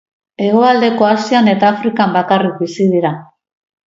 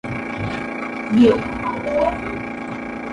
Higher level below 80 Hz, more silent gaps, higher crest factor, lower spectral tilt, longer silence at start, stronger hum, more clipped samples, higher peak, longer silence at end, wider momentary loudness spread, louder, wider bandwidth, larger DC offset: second, -60 dBFS vs -42 dBFS; neither; about the same, 14 dB vs 18 dB; about the same, -6.5 dB/octave vs -7 dB/octave; first, 0.4 s vs 0.05 s; neither; neither; first, 0 dBFS vs -4 dBFS; first, 0.6 s vs 0 s; second, 8 LU vs 14 LU; first, -13 LUFS vs -21 LUFS; second, 7.8 kHz vs 10.5 kHz; neither